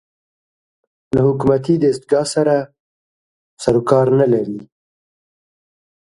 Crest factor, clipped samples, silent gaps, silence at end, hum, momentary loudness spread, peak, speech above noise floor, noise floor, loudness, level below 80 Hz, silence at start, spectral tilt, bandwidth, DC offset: 18 dB; under 0.1%; 2.80-3.57 s; 1.4 s; none; 9 LU; 0 dBFS; over 75 dB; under -90 dBFS; -16 LUFS; -50 dBFS; 1.15 s; -7 dB/octave; 11.5 kHz; under 0.1%